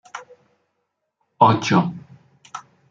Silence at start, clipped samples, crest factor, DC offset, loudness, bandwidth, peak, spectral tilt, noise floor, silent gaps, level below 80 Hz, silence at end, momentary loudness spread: 0.15 s; under 0.1%; 20 dB; under 0.1%; -18 LUFS; 7.6 kHz; -2 dBFS; -6 dB/octave; -75 dBFS; none; -64 dBFS; 0.3 s; 23 LU